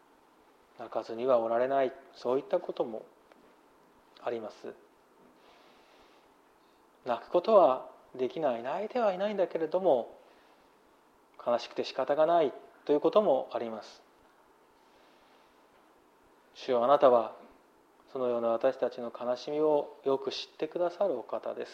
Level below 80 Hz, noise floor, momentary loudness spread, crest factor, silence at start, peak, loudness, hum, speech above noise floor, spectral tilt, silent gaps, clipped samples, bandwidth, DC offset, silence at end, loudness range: -80 dBFS; -63 dBFS; 16 LU; 22 dB; 0.8 s; -10 dBFS; -30 LUFS; none; 34 dB; -6 dB/octave; none; under 0.1%; 7.6 kHz; under 0.1%; 0 s; 13 LU